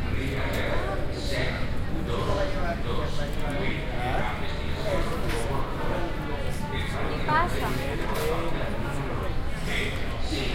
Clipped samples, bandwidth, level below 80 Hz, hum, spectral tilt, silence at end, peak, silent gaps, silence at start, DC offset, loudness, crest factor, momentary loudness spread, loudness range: under 0.1%; 16 kHz; -32 dBFS; none; -5.5 dB/octave; 0 s; -10 dBFS; none; 0 s; under 0.1%; -29 LUFS; 16 dB; 4 LU; 1 LU